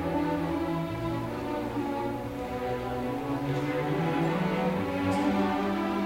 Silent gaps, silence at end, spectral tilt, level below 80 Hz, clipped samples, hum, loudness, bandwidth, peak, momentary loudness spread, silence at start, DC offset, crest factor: none; 0 s; -7 dB/octave; -50 dBFS; under 0.1%; none; -30 LUFS; 16 kHz; -16 dBFS; 5 LU; 0 s; under 0.1%; 14 dB